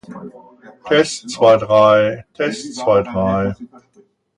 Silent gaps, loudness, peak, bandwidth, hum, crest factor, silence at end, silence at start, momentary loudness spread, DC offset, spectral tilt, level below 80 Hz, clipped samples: none; -15 LUFS; 0 dBFS; 11 kHz; none; 16 dB; 0.7 s; 0.1 s; 12 LU; under 0.1%; -5 dB/octave; -48 dBFS; under 0.1%